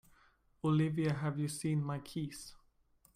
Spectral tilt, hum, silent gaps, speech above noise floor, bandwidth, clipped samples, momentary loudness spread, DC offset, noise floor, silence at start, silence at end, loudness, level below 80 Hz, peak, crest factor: -6.5 dB/octave; none; none; 35 dB; 15 kHz; under 0.1%; 12 LU; under 0.1%; -70 dBFS; 0.65 s; 0.6 s; -36 LUFS; -66 dBFS; -22 dBFS; 16 dB